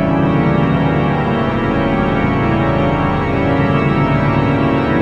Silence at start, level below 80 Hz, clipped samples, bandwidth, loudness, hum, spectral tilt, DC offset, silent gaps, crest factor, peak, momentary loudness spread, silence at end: 0 s; -30 dBFS; under 0.1%; 7 kHz; -15 LUFS; none; -9 dB/octave; under 0.1%; none; 12 dB; -2 dBFS; 2 LU; 0 s